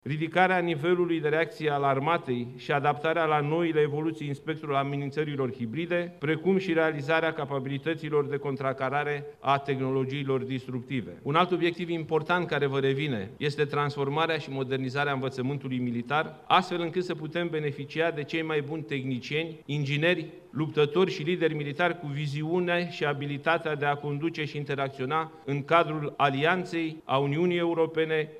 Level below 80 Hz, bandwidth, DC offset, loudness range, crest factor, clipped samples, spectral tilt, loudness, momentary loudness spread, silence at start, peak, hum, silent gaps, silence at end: -70 dBFS; 12 kHz; under 0.1%; 3 LU; 22 dB; under 0.1%; -7 dB/octave; -28 LUFS; 7 LU; 0.05 s; -6 dBFS; none; none; 0 s